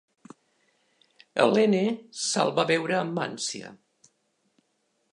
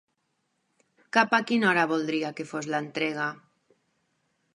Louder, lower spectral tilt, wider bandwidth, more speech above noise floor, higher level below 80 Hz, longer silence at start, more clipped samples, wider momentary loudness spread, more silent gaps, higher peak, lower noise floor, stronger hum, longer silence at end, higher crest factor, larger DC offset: about the same, -25 LUFS vs -26 LUFS; about the same, -4 dB/octave vs -4.5 dB/octave; about the same, 11 kHz vs 11 kHz; about the same, 48 dB vs 50 dB; about the same, -80 dBFS vs -80 dBFS; first, 1.35 s vs 1.15 s; neither; about the same, 11 LU vs 10 LU; neither; about the same, -6 dBFS vs -6 dBFS; about the same, -73 dBFS vs -76 dBFS; neither; first, 1.4 s vs 1.2 s; about the same, 22 dB vs 24 dB; neither